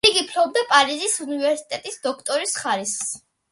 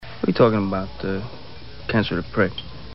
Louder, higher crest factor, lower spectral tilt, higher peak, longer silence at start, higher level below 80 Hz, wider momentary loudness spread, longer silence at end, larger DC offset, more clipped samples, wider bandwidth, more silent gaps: about the same, -21 LUFS vs -22 LUFS; about the same, 22 dB vs 20 dB; second, -0.5 dB/octave vs -5 dB/octave; first, 0 dBFS vs -4 dBFS; about the same, 0.05 s vs 0 s; second, -62 dBFS vs -44 dBFS; second, 11 LU vs 18 LU; first, 0.35 s vs 0 s; second, under 0.1% vs 1%; neither; first, 12 kHz vs 5.8 kHz; neither